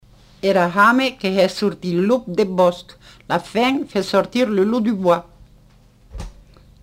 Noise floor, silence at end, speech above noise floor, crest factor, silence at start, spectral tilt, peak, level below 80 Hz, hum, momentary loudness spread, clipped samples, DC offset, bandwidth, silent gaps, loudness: -50 dBFS; 0.5 s; 32 dB; 16 dB; 0.45 s; -6 dB/octave; -2 dBFS; -46 dBFS; 50 Hz at -50 dBFS; 10 LU; under 0.1%; under 0.1%; 16 kHz; none; -18 LUFS